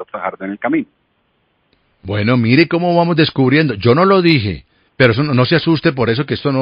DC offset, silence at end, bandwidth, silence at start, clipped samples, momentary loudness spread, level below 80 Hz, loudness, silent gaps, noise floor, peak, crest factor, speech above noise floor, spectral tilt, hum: under 0.1%; 0 s; 5.4 kHz; 0 s; under 0.1%; 12 LU; -46 dBFS; -14 LUFS; none; -62 dBFS; 0 dBFS; 14 dB; 49 dB; -9 dB/octave; none